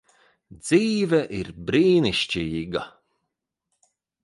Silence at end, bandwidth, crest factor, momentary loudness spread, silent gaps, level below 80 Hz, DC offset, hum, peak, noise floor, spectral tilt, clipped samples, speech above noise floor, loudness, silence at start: 1.35 s; 11.5 kHz; 18 dB; 13 LU; none; -52 dBFS; under 0.1%; none; -6 dBFS; -81 dBFS; -5.5 dB/octave; under 0.1%; 59 dB; -23 LUFS; 0.5 s